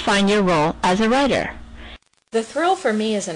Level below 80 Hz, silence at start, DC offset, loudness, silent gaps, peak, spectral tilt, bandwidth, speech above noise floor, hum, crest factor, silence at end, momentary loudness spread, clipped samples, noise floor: -44 dBFS; 0 s; under 0.1%; -19 LUFS; none; -8 dBFS; -4.5 dB/octave; 10.5 kHz; 24 dB; none; 12 dB; 0 s; 11 LU; under 0.1%; -42 dBFS